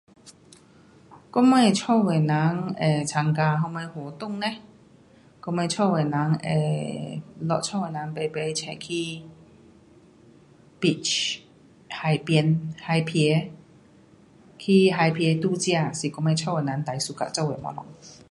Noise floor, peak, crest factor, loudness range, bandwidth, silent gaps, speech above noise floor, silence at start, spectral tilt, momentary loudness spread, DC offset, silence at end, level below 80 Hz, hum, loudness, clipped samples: -54 dBFS; -6 dBFS; 20 dB; 7 LU; 11.5 kHz; none; 30 dB; 0.25 s; -5.5 dB/octave; 14 LU; under 0.1%; 0.15 s; -64 dBFS; none; -24 LUFS; under 0.1%